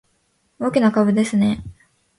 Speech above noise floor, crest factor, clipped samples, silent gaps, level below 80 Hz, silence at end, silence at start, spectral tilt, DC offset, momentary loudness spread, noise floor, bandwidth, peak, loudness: 48 dB; 16 dB; under 0.1%; none; -50 dBFS; 0.45 s; 0.6 s; -6.5 dB/octave; under 0.1%; 9 LU; -65 dBFS; 11.5 kHz; -4 dBFS; -19 LUFS